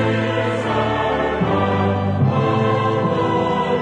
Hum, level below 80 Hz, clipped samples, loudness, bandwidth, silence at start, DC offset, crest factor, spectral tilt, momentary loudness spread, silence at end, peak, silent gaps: none; -44 dBFS; under 0.1%; -19 LUFS; 9.8 kHz; 0 s; under 0.1%; 12 dB; -7.5 dB/octave; 2 LU; 0 s; -6 dBFS; none